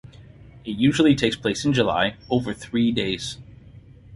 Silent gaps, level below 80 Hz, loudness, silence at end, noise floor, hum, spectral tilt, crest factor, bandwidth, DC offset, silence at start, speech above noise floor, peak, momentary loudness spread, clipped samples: none; -48 dBFS; -22 LUFS; 0 s; -46 dBFS; none; -5.5 dB/octave; 20 dB; 11.5 kHz; under 0.1%; 0.2 s; 25 dB; -4 dBFS; 15 LU; under 0.1%